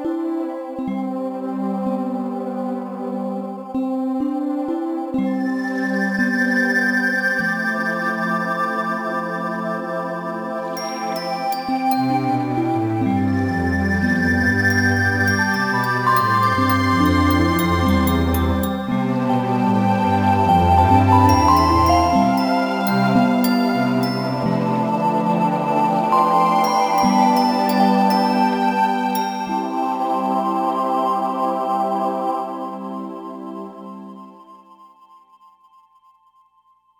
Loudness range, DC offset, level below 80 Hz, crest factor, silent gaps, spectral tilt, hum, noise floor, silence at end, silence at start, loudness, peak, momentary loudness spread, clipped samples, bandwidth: 9 LU; under 0.1%; -40 dBFS; 18 dB; none; -6.5 dB/octave; 60 Hz at -60 dBFS; -58 dBFS; 2.45 s; 0 s; -19 LUFS; 0 dBFS; 10 LU; under 0.1%; 19 kHz